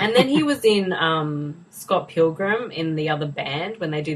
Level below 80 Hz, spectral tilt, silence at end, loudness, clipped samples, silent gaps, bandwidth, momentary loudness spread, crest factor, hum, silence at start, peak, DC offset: -62 dBFS; -5.5 dB/octave; 0 s; -22 LUFS; under 0.1%; none; 14.5 kHz; 9 LU; 20 dB; none; 0 s; -2 dBFS; under 0.1%